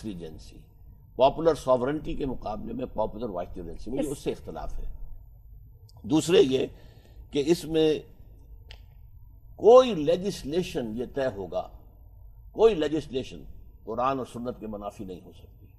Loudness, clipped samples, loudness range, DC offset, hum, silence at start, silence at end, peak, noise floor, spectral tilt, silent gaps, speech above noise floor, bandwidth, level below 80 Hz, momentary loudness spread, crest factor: -26 LUFS; under 0.1%; 9 LU; under 0.1%; none; 0 s; 0.15 s; -6 dBFS; -49 dBFS; -5.5 dB/octave; none; 23 dB; 13 kHz; -44 dBFS; 20 LU; 22 dB